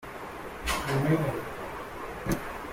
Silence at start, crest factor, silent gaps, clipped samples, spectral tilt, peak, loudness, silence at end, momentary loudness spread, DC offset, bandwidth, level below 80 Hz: 0 s; 18 dB; none; under 0.1%; -5.5 dB/octave; -14 dBFS; -32 LUFS; 0 s; 13 LU; under 0.1%; 16.5 kHz; -46 dBFS